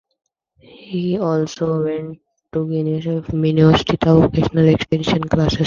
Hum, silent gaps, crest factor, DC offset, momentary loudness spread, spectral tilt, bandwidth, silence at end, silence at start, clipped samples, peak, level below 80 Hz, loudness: none; none; 16 dB; under 0.1%; 11 LU; -7.5 dB/octave; 7.2 kHz; 0 s; 0.8 s; under 0.1%; 0 dBFS; -38 dBFS; -17 LUFS